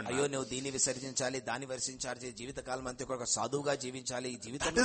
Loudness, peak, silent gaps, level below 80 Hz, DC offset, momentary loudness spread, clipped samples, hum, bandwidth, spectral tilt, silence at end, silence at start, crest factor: -36 LUFS; -14 dBFS; none; -60 dBFS; under 0.1%; 8 LU; under 0.1%; none; 8.8 kHz; -2.5 dB/octave; 0 s; 0 s; 22 dB